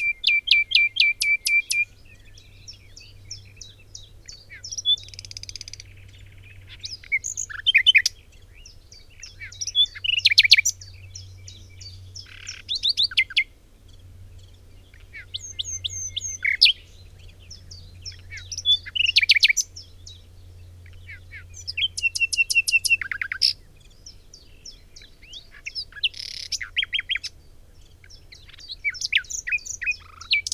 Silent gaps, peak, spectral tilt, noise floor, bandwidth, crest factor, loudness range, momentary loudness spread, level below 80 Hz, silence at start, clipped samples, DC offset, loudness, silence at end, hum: none; 0 dBFS; 2 dB/octave; -49 dBFS; 16 kHz; 26 dB; 10 LU; 26 LU; -50 dBFS; 0 s; under 0.1%; under 0.1%; -20 LUFS; 0.05 s; none